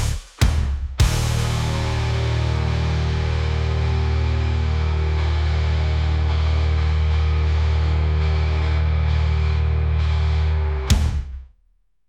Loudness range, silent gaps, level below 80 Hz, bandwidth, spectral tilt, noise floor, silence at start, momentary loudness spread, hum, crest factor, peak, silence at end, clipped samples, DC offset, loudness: 1 LU; none; -24 dBFS; 12.5 kHz; -6 dB/octave; -62 dBFS; 0 s; 2 LU; none; 14 dB; -6 dBFS; 0.65 s; under 0.1%; under 0.1%; -21 LUFS